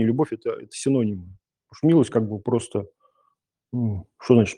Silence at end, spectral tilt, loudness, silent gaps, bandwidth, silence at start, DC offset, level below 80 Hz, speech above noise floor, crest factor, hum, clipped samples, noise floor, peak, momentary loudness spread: 0.05 s; -7 dB/octave; -24 LUFS; none; 10.5 kHz; 0 s; under 0.1%; -62 dBFS; 49 dB; 20 dB; none; under 0.1%; -71 dBFS; -2 dBFS; 13 LU